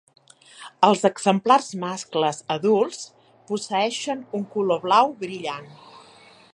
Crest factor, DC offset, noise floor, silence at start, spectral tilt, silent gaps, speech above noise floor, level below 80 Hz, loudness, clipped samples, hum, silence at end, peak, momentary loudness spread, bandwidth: 22 dB; under 0.1%; -50 dBFS; 0.6 s; -4.5 dB/octave; none; 28 dB; -76 dBFS; -22 LUFS; under 0.1%; none; 0.55 s; -2 dBFS; 14 LU; 11 kHz